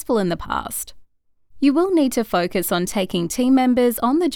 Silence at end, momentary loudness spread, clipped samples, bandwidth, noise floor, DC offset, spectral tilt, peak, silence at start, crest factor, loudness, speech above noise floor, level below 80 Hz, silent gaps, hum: 0 s; 8 LU; under 0.1%; 19 kHz; -55 dBFS; under 0.1%; -5 dB/octave; -6 dBFS; 0 s; 14 dB; -20 LUFS; 36 dB; -46 dBFS; none; none